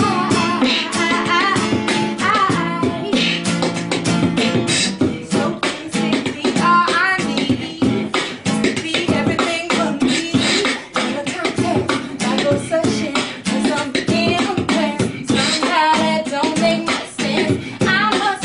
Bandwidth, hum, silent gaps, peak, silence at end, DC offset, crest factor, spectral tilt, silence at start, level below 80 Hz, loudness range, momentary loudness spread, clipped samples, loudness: 11 kHz; none; none; -2 dBFS; 0 s; under 0.1%; 16 dB; -4 dB/octave; 0 s; -50 dBFS; 2 LU; 5 LU; under 0.1%; -17 LUFS